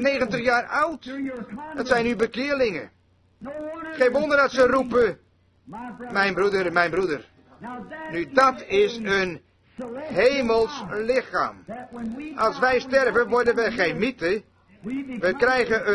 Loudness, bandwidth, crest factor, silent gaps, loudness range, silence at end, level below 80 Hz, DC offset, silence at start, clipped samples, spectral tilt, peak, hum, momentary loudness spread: -23 LUFS; 11 kHz; 20 dB; none; 3 LU; 0 s; -54 dBFS; under 0.1%; 0 s; under 0.1%; -5 dB/octave; -4 dBFS; none; 17 LU